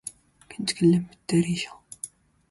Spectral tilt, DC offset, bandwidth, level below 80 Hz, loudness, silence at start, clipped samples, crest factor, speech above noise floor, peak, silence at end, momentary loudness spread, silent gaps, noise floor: -5.5 dB/octave; under 0.1%; 11.5 kHz; -60 dBFS; -25 LUFS; 0.05 s; under 0.1%; 18 dB; 20 dB; -10 dBFS; 0.45 s; 18 LU; none; -44 dBFS